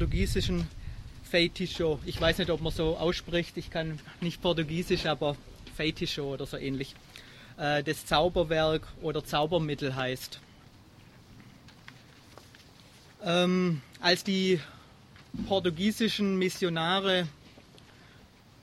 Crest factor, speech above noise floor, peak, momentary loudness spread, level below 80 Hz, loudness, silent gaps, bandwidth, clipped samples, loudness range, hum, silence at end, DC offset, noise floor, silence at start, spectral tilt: 22 dB; 26 dB; -8 dBFS; 14 LU; -44 dBFS; -30 LUFS; none; 14.5 kHz; under 0.1%; 5 LU; none; 1.15 s; under 0.1%; -56 dBFS; 0 s; -5 dB/octave